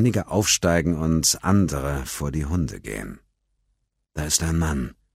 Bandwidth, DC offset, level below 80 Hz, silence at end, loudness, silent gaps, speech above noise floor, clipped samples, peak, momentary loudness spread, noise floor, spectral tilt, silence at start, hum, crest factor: 16 kHz; under 0.1%; -36 dBFS; 0.25 s; -22 LUFS; none; 50 dB; under 0.1%; -4 dBFS; 14 LU; -73 dBFS; -4 dB/octave; 0 s; none; 18 dB